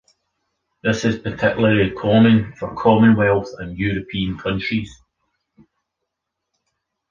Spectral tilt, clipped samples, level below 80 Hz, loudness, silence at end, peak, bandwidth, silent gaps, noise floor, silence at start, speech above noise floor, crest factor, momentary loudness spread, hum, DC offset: -7 dB/octave; under 0.1%; -44 dBFS; -18 LUFS; 2.15 s; -2 dBFS; 7.2 kHz; none; -80 dBFS; 0.85 s; 63 dB; 18 dB; 12 LU; none; under 0.1%